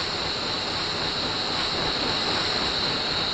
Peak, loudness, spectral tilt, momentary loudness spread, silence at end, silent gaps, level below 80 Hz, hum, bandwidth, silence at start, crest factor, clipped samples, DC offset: -12 dBFS; -24 LUFS; -3 dB/octave; 3 LU; 0 s; none; -46 dBFS; none; 10.5 kHz; 0 s; 14 dB; under 0.1%; under 0.1%